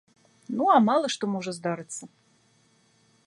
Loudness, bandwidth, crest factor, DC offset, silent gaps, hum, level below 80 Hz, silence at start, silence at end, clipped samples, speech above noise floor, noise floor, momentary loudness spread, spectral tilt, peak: -25 LUFS; 11.5 kHz; 20 dB; under 0.1%; none; none; -76 dBFS; 0.5 s; 1.2 s; under 0.1%; 39 dB; -64 dBFS; 16 LU; -5 dB/octave; -8 dBFS